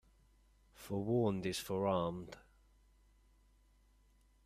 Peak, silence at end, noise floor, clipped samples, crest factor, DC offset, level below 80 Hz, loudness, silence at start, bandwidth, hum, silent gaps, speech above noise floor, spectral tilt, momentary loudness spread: -22 dBFS; 2.05 s; -69 dBFS; under 0.1%; 20 dB; under 0.1%; -66 dBFS; -37 LUFS; 0.8 s; 15.5 kHz; none; none; 33 dB; -6 dB/octave; 20 LU